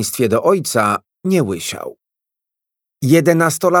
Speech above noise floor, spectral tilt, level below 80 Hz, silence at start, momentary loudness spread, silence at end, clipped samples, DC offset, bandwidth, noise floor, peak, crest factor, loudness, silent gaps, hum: 69 dB; -5 dB/octave; -60 dBFS; 0 s; 11 LU; 0 s; under 0.1%; under 0.1%; 19.5 kHz; -84 dBFS; 0 dBFS; 16 dB; -16 LUFS; none; none